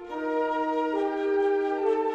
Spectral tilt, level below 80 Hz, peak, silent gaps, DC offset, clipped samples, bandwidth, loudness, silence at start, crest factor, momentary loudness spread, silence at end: -5 dB/octave; -64 dBFS; -14 dBFS; none; under 0.1%; under 0.1%; 8 kHz; -27 LUFS; 0 s; 12 dB; 3 LU; 0 s